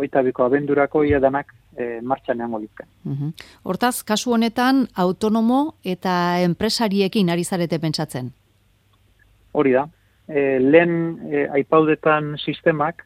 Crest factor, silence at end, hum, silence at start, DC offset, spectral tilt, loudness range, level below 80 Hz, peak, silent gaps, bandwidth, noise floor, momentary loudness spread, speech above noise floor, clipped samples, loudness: 20 dB; 0.15 s; none; 0 s; under 0.1%; -5.5 dB/octave; 5 LU; -52 dBFS; 0 dBFS; none; 16 kHz; -59 dBFS; 12 LU; 40 dB; under 0.1%; -20 LUFS